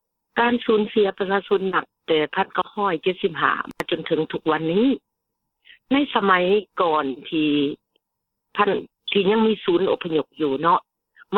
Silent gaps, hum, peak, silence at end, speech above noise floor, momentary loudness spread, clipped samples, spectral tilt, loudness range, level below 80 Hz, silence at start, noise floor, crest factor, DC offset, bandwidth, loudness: none; none; -2 dBFS; 0 s; 59 dB; 7 LU; under 0.1%; -7 dB/octave; 1 LU; -64 dBFS; 0.35 s; -80 dBFS; 20 dB; under 0.1%; 7.4 kHz; -22 LUFS